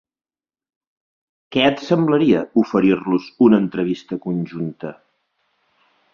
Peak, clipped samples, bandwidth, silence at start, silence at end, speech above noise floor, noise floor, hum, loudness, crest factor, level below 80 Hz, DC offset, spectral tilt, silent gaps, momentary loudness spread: -2 dBFS; under 0.1%; 7 kHz; 1.5 s; 1.2 s; 51 dB; -68 dBFS; none; -18 LUFS; 18 dB; -58 dBFS; under 0.1%; -7.5 dB/octave; none; 12 LU